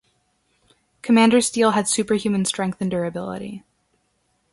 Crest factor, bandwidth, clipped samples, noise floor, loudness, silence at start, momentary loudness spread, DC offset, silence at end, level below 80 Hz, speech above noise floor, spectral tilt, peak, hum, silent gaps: 20 dB; 11.5 kHz; under 0.1%; -68 dBFS; -20 LUFS; 1.05 s; 17 LU; under 0.1%; 0.95 s; -60 dBFS; 48 dB; -4 dB/octave; -2 dBFS; none; none